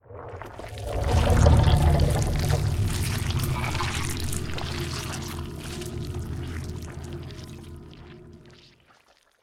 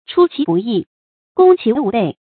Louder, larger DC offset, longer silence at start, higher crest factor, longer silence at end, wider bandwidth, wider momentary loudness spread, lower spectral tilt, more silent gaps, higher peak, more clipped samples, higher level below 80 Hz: second, -26 LUFS vs -15 LUFS; neither; about the same, 0.1 s vs 0.1 s; first, 22 dB vs 16 dB; first, 0.9 s vs 0.25 s; first, 16.5 kHz vs 4.5 kHz; first, 21 LU vs 10 LU; second, -5.5 dB/octave vs -12 dB/octave; second, none vs 0.87-1.35 s; second, -4 dBFS vs 0 dBFS; neither; first, -30 dBFS vs -58 dBFS